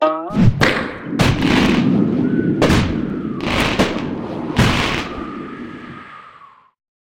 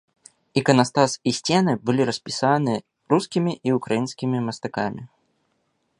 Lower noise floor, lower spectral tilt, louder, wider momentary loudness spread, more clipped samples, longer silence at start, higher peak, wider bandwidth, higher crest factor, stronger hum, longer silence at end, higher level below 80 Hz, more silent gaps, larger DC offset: second, -45 dBFS vs -71 dBFS; about the same, -6 dB/octave vs -5.5 dB/octave; first, -17 LUFS vs -22 LUFS; first, 16 LU vs 9 LU; neither; second, 0 s vs 0.55 s; about the same, 0 dBFS vs -2 dBFS; first, 16.5 kHz vs 11.5 kHz; second, 16 dB vs 22 dB; neither; second, 0.65 s vs 0.95 s; first, -32 dBFS vs -62 dBFS; neither; neither